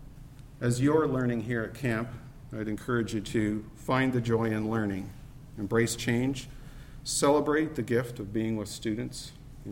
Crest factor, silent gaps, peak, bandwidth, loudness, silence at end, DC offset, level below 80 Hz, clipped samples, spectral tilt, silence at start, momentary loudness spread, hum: 18 dB; none; -12 dBFS; 16.5 kHz; -30 LUFS; 0 s; under 0.1%; -50 dBFS; under 0.1%; -5.5 dB/octave; 0 s; 20 LU; none